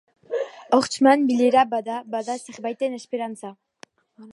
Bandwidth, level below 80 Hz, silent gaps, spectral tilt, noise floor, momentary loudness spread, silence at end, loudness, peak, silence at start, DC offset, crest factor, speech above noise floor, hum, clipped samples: 11.5 kHz; -74 dBFS; none; -4 dB/octave; -52 dBFS; 14 LU; 0 s; -22 LUFS; -4 dBFS; 0.3 s; under 0.1%; 20 dB; 31 dB; none; under 0.1%